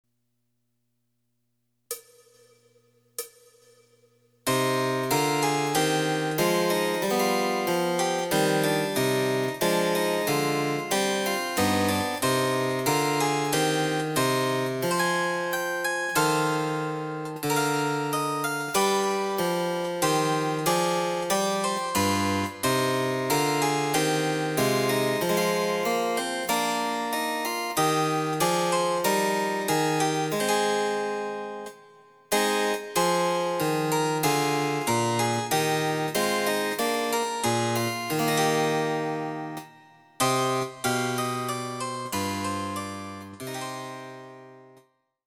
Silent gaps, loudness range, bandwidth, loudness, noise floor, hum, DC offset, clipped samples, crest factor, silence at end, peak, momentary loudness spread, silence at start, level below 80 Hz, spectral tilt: none; 4 LU; over 20 kHz; -25 LUFS; -77 dBFS; none; under 0.1%; under 0.1%; 16 dB; 0.6 s; -10 dBFS; 8 LU; 1.9 s; -68 dBFS; -4 dB/octave